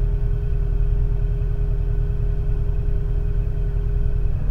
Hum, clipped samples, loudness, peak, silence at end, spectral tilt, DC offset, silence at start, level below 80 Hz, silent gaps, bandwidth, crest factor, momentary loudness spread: none; under 0.1%; -25 LUFS; -8 dBFS; 0 s; -10 dB/octave; under 0.1%; 0 s; -20 dBFS; none; 3.3 kHz; 12 dB; 2 LU